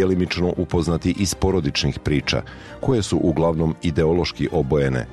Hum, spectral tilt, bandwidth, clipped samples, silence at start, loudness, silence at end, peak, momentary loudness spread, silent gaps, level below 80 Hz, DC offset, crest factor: none; -6 dB/octave; 12.5 kHz; under 0.1%; 0 s; -21 LUFS; 0 s; -8 dBFS; 3 LU; none; -36 dBFS; 0.2%; 12 dB